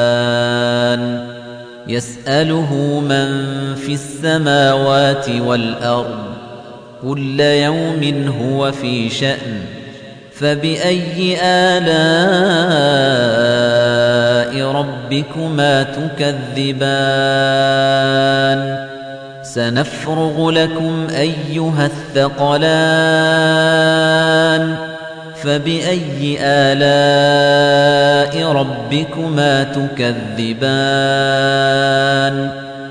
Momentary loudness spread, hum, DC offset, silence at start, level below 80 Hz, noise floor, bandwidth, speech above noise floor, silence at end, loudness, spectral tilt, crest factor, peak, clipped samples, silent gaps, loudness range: 11 LU; none; under 0.1%; 0 s; -52 dBFS; -34 dBFS; 10 kHz; 20 dB; 0 s; -14 LUFS; -5.5 dB/octave; 14 dB; -2 dBFS; under 0.1%; none; 5 LU